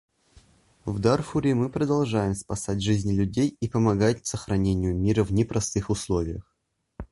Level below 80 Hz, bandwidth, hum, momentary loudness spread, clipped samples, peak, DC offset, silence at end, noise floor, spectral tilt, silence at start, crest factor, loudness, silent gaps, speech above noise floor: -42 dBFS; 11.5 kHz; none; 7 LU; under 0.1%; -8 dBFS; under 0.1%; 0.05 s; -57 dBFS; -6.5 dB/octave; 0.35 s; 16 dB; -25 LUFS; none; 33 dB